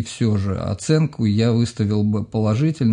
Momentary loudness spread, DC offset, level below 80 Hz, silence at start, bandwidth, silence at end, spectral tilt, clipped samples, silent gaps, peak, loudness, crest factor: 4 LU; under 0.1%; -52 dBFS; 0 s; 10.5 kHz; 0 s; -7 dB/octave; under 0.1%; none; -4 dBFS; -20 LUFS; 14 dB